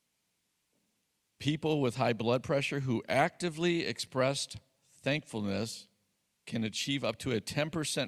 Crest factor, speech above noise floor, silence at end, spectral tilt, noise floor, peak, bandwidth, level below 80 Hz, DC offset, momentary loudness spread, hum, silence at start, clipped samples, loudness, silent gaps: 22 dB; 47 dB; 0 s; -4.5 dB/octave; -79 dBFS; -12 dBFS; 14 kHz; -66 dBFS; under 0.1%; 8 LU; none; 1.4 s; under 0.1%; -33 LUFS; none